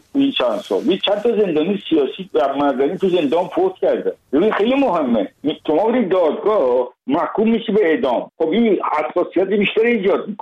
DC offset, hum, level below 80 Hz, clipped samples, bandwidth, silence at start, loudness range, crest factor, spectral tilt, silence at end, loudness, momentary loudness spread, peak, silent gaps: under 0.1%; none; -58 dBFS; under 0.1%; 9 kHz; 0.15 s; 1 LU; 10 dB; -7 dB/octave; 0.05 s; -18 LUFS; 4 LU; -6 dBFS; none